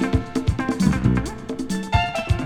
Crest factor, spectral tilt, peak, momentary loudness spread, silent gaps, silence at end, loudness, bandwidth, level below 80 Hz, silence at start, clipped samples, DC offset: 18 dB; -6.5 dB/octave; -4 dBFS; 8 LU; none; 0 s; -23 LUFS; 15 kHz; -30 dBFS; 0 s; under 0.1%; under 0.1%